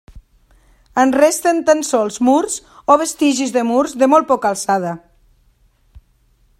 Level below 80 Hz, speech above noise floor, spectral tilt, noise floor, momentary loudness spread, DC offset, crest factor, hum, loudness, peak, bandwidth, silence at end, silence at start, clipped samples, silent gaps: -50 dBFS; 42 dB; -3.5 dB/octave; -56 dBFS; 9 LU; under 0.1%; 16 dB; none; -15 LUFS; 0 dBFS; 16 kHz; 1.6 s; 0.15 s; under 0.1%; none